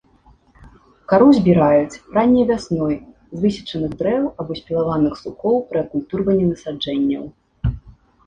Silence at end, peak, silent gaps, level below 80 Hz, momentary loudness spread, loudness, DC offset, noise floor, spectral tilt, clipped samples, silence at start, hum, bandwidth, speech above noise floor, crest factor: 0.35 s; -2 dBFS; none; -40 dBFS; 12 LU; -19 LUFS; under 0.1%; -53 dBFS; -8 dB/octave; under 0.1%; 0.65 s; none; 9.4 kHz; 35 dB; 16 dB